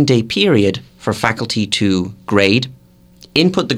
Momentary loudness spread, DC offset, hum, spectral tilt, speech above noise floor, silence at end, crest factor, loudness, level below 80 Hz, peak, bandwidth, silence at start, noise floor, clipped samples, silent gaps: 7 LU; under 0.1%; none; -5 dB/octave; 30 dB; 0 s; 16 dB; -15 LUFS; -48 dBFS; 0 dBFS; 15 kHz; 0 s; -45 dBFS; under 0.1%; none